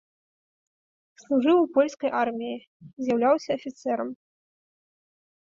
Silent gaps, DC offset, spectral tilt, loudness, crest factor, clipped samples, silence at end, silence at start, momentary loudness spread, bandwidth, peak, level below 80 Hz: 2.67-2.80 s; under 0.1%; -5.5 dB/octave; -25 LUFS; 18 dB; under 0.1%; 1.35 s; 1.3 s; 13 LU; 7.6 kHz; -10 dBFS; -72 dBFS